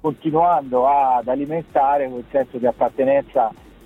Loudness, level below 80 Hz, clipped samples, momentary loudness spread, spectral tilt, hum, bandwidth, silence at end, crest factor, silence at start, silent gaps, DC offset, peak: -19 LUFS; -52 dBFS; under 0.1%; 6 LU; -8.5 dB/octave; none; 4.1 kHz; 0.35 s; 14 dB; 0.05 s; none; under 0.1%; -4 dBFS